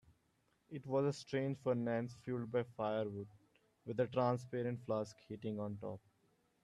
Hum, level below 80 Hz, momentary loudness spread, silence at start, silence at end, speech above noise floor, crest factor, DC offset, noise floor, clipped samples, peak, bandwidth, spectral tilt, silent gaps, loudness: none; -78 dBFS; 13 LU; 0.7 s; 0.65 s; 39 dB; 18 dB; under 0.1%; -78 dBFS; under 0.1%; -24 dBFS; 11.5 kHz; -7.5 dB/octave; none; -40 LUFS